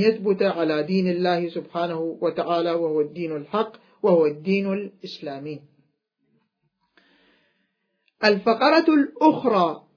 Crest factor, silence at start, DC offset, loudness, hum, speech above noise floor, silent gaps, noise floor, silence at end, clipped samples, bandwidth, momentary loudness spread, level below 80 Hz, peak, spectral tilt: 20 dB; 0 s; under 0.1%; -22 LUFS; none; 51 dB; none; -73 dBFS; 0.2 s; under 0.1%; 5.4 kHz; 15 LU; -74 dBFS; -4 dBFS; -7.5 dB/octave